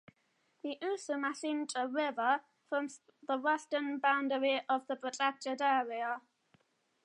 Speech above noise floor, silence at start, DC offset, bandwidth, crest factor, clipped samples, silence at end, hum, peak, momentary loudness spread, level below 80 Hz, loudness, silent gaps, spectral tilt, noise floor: 42 dB; 0.65 s; under 0.1%; 11 kHz; 20 dB; under 0.1%; 0.85 s; none; -16 dBFS; 8 LU; under -90 dBFS; -35 LUFS; none; -2 dB/octave; -76 dBFS